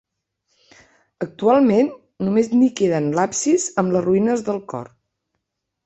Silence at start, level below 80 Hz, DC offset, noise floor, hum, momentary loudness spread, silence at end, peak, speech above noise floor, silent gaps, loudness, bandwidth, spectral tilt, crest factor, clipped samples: 1.2 s; -60 dBFS; under 0.1%; -78 dBFS; none; 12 LU; 1 s; -4 dBFS; 60 dB; none; -19 LUFS; 8.2 kHz; -5.5 dB/octave; 16 dB; under 0.1%